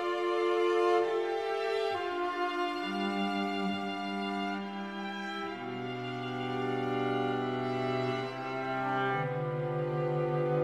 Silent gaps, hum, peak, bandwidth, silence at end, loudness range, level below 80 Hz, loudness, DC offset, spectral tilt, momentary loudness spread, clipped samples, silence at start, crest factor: none; none; -18 dBFS; 12 kHz; 0 s; 5 LU; -74 dBFS; -33 LUFS; under 0.1%; -6.5 dB/octave; 8 LU; under 0.1%; 0 s; 16 dB